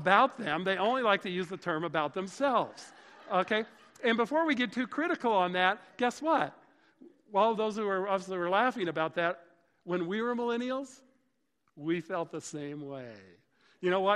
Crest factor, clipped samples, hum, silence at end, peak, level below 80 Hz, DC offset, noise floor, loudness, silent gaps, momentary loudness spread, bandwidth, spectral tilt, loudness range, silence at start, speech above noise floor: 24 dB; under 0.1%; none; 0 s; -8 dBFS; -76 dBFS; under 0.1%; -78 dBFS; -31 LUFS; none; 12 LU; 12 kHz; -5 dB/octave; 6 LU; 0 s; 47 dB